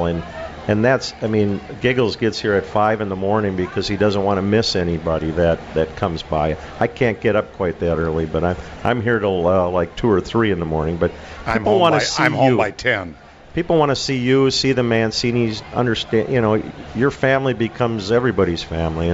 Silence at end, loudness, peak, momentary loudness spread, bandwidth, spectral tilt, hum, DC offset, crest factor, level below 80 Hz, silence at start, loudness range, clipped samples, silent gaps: 0 s; -19 LUFS; -2 dBFS; 7 LU; 8 kHz; -5.5 dB/octave; none; under 0.1%; 16 dB; -38 dBFS; 0 s; 3 LU; under 0.1%; none